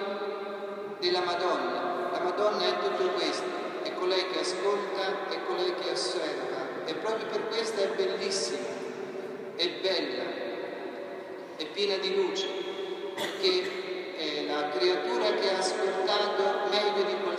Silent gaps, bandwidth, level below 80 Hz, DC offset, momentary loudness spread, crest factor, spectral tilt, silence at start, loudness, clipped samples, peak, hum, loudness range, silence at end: none; 14 kHz; under -90 dBFS; under 0.1%; 10 LU; 18 dB; -3 dB/octave; 0 s; -30 LUFS; under 0.1%; -12 dBFS; none; 4 LU; 0 s